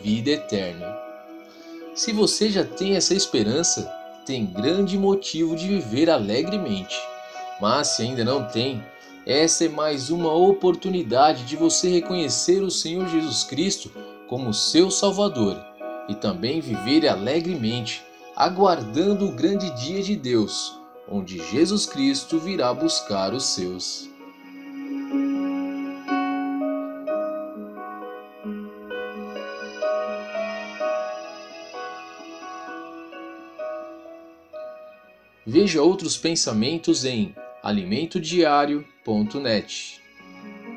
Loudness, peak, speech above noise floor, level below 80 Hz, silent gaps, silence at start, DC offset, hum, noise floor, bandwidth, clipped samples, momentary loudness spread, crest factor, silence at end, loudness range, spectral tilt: -23 LUFS; -4 dBFS; 31 dB; -58 dBFS; none; 0 s; under 0.1%; none; -53 dBFS; 13 kHz; under 0.1%; 18 LU; 20 dB; 0 s; 10 LU; -4 dB/octave